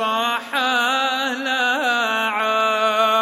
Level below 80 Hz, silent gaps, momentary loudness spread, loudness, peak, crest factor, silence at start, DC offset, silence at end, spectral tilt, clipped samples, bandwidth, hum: -78 dBFS; none; 4 LU; -19 LUFS; -4 dBFS; 14 dB; 0 s; under 0.1%; 0 s; -1.5 dB/octave; under 0.1%; 16 kHz; none